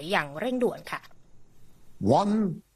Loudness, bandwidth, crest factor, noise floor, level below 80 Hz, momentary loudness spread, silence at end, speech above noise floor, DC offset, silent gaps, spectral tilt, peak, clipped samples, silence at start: -27 LUFS; 14 kHz; 20 dB; -48 dBFS; -60 dBFS; 14 LU; 0.15 s; 22 dB; under 0.1%; none; -6.5 dB/octave; -8 dBFS; under 0.1%; 0 s